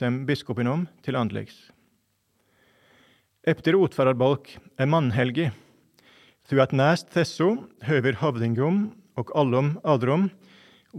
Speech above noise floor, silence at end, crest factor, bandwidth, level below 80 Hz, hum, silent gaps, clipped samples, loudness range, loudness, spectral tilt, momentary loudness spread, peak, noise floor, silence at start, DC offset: 47 dB; 0 s; 20 dB; 12.5 kHz; -68 dBFS; none; none; under 0.1%; 5 LU; -24 LUFS; -7.5 dB/octave; 9 LU; -4 dBFS; -70 dBFS; 0 s; under 0.1%